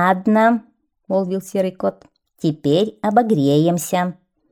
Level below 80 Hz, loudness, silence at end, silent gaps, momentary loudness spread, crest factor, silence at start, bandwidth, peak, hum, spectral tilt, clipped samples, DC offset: -62 dBFS; -19 LUFS; 0.4 s; none; 9 LU; 16 dB; 0 s; 19 kHz; -2 dBFS; none; -6 dB/octave; under 0.1%; under 0.1%